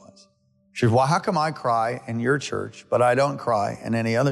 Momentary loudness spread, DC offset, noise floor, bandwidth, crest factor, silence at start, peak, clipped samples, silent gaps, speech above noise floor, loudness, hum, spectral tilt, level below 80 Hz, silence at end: 7 LU; under 0.1%; -63 dBFS; 12.5 kHz; 14 dB; 0.75 s; -10 dBFS; under 0.1%; none; 41 dB; -23 LUFS; none; -6 dB/octave; -62 dBFS; 0 s